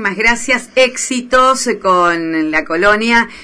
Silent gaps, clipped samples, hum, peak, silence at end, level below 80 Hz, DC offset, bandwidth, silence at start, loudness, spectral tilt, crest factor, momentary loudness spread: none; under 0.1%; none; -2 dBFS; 0 s; -38 dBFS; under 0.1%; 11 kHz; 0 s; -12 LUFS; -2.5 dB/octave; 12 dB; 5 LU